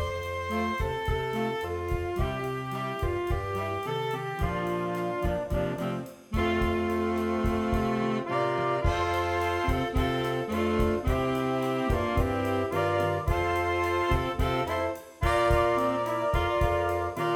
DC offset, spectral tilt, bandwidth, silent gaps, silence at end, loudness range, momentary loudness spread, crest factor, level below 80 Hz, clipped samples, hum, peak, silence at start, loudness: under 0.1%; -6.5 dB/octave; 18 kHz; none; 0 s; 4 LU; 5 LU; 16 dB; -38 dBFS; under 0.1%; none; -10 dBFS; 0 s; -28 LUFS